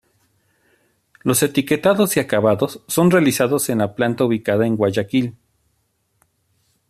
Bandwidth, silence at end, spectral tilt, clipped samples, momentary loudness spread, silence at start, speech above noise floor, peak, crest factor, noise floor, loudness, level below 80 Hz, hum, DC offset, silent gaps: 14.5 kHz; 1.6 s; -5 dB/octave; under 0.1%; 6 LU; 1.25 s; 50 dB; -2 dBFS; 16 dB; -67 dBFS; -18 LUFS; -58 dBFS; none; under 0.1%; none